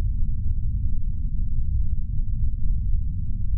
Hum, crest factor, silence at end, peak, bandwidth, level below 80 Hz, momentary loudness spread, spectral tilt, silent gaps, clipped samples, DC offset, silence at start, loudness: none; 10 dB; 0 s; -10 dBFS; 0.3 kHz; -24 dBFS; 3 LU; -18 dB/octave; none; under 0.1%; under 0.1%; 0 s; -29 LUFS